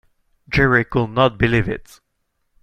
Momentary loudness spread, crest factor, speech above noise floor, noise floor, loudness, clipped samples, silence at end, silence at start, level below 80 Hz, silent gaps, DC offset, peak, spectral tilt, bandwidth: 9 LU; 18 dB; 53 dB; -71 dBFS; -18 LUFS; under 0.1%; 0.8 s; 0.5 s; -36 dBFS; none; under 0.1%; -2 dBFS; -7 dB/octave; 13.5 kHz